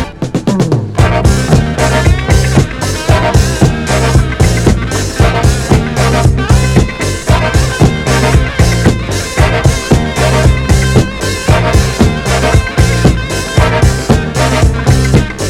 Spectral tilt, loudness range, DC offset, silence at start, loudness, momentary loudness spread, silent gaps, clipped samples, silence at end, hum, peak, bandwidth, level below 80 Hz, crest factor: -5.5 dB/octave; 1 LU; under 0.1%; 0 s; -10 LUFS; 3 LU; none; 0.9%; 0 s; none; 0 dBFS; 15.5 kHz; -16 dBFS; 10 dB